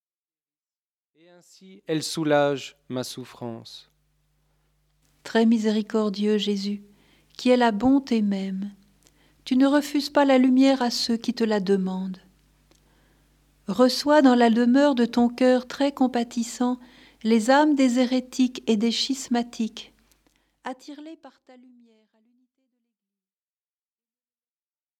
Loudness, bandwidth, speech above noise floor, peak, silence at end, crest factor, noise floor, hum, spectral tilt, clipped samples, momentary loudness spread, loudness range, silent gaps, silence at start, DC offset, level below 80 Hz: -22 LUFS; 14 kHz; over 68 dB; -6 dBFS; 3.7 s; 18 dB; under -90 dBFS; none; -5 dB/octave; under 0.1%; 19 LU; 8 LU; none; 1.9 s; under 0.1%; -64 dBFS